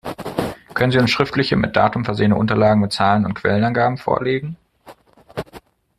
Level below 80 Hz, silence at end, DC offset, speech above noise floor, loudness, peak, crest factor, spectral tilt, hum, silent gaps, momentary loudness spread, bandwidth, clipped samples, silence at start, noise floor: -46 dBFS; 0.4 s; under 0.1%; 29 dB; -18 LUFS; 0 dBFS; 18 dB; -6.5 dB/octave; none; none; 16 LU; 14 kHz; under 0.1%; 0.05 s; -46 dBFS